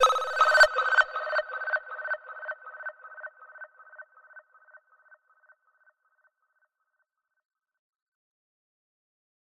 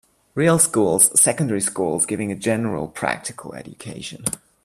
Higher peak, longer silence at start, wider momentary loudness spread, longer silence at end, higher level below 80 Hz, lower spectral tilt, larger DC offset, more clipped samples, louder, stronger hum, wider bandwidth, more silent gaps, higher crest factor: second, -8 dBFS vs 0 dBFS; second, 0 s vs 0.35 s; first, 26 LU vs 19 LU; first, 5.05 s vs 0.3 s; second, -70 dBFS vs -56 dBFS; second, 2 dB/octave vs -4 dB/octave; neither; neither; second, -25 LUFS vs -19 LUFS; neither; about the same, 15 kHz vs 15.5 kHz; neither; about the same, 24 dB vs 22 dB